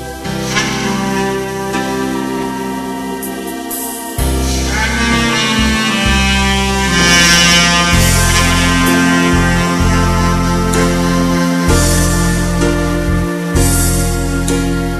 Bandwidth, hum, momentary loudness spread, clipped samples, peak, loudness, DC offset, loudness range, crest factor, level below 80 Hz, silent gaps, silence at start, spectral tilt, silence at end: 14 kHz; none; 11 LU; under 0.1%; 0 dBFS; -12 LUFS; under 0.1%; 9 LU; 12 dB; -22 dBFS; none; 0 s; -4 dB/octave; 0 s